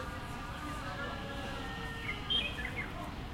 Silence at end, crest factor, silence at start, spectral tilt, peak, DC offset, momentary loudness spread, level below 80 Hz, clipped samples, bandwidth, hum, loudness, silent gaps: 0 s; 18 dB; 0 s; -4 dB/octave; -22 dBFS; under 0.1%; 10 LU; -48 dBFS; under 0.1%; 16.5 kHz; none; -38 LUFS; none